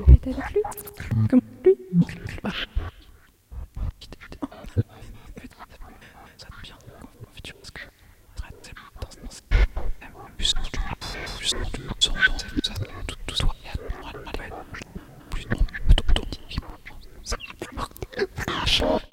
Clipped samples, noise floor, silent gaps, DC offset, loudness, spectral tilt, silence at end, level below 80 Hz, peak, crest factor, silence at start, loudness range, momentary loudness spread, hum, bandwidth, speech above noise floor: under 0.1%; -52 dBFS; none; under 0.1%; -26 LUFS; -5 dB/octave; 0.05 s; -28 dBFS; -2 dBFS; 24 dB; 0 s; 16 LU; 23 LU; none; 16 kHz; 34 dB